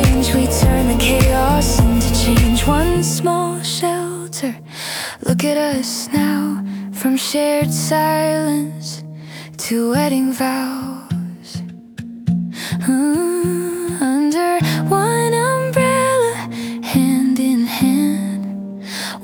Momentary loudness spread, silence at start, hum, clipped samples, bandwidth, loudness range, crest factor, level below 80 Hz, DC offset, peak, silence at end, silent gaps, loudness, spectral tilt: 11 LU; 0 s; none; under 0.1%; over 20 kHz; 6 LU; 14 dB; -28 dBFS; under 0.1%; -2 dBFS; 0 s; none; -17 LUFS; -5 dB/octave